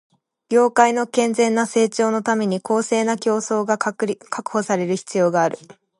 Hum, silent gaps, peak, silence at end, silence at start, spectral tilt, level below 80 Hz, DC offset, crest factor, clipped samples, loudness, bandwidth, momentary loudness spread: none; none; 0 dBFS; 0.25 s; 0.5 s; -4.5 dB/octave; -72 dBFS; under 0.1%; 20 dB; under 0.1%; -20 LUFS; 11.5 kHz; 7 LU